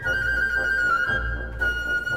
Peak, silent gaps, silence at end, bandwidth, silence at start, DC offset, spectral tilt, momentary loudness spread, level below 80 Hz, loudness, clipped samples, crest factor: -12 dBFS; none; 0 s; 16 kHz; 0 s; 0.3%; -4 dB/octave; 5 LU; -34 dBFS; -23 LUFS; under 0.1%; 12 dB